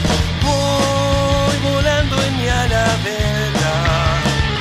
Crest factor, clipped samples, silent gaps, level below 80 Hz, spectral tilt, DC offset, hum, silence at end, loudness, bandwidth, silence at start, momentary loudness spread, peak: 14 dB; under 0.1%; none; -24 dBFS; -4.5 dB/octave; under 0.1%; none; 0 s; -16 LUFS; 15 kHz; 0 s; 2 LU; -2 dBFS